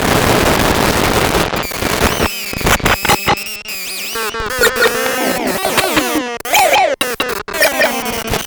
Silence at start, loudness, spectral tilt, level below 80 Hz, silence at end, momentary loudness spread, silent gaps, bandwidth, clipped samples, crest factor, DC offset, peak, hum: 0 s; -14 LUFS; -3 dB/octave; -30 dBFS; 0 s; 7 LU; none; over 20 kHz; under 0.1%; 14 dB; under 0.1%; 0 dBFS; none